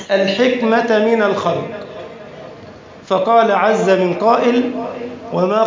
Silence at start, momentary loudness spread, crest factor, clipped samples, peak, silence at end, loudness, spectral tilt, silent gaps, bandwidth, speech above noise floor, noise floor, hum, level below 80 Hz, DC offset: 0 s; 19 LU; 14 dB; under 0.1%; -2 dBFS; 0 s; -15 LUFS; -6 dB/octave; none; 7.6 kHz; 22 dB; -37 dBFS; none; -58 dBFS; under 0.1%